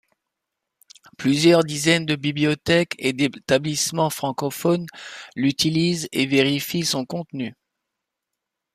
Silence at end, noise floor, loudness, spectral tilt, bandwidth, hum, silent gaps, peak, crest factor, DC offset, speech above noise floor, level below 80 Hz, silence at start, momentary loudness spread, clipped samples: 1.2 s; -83 dBFS; -21 LUFS; -4.5 dB/octave; 15.5 kHz; none; none; -2 dBFS; 20 dB; under 0.1%; 61 dB; -58 dBFS; 1.2 s; 11 LU; under 0.1%